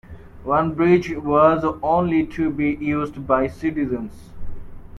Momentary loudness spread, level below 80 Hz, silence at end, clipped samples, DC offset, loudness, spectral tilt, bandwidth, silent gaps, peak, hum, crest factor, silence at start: 17 LU; -40 dBFS; 0 s; under 0.1%; under 0.1%; -20 LUFS; -8.5 dB/octave; 11 kHz; none; -2 dBFS; none; 18 dB; 0.05 s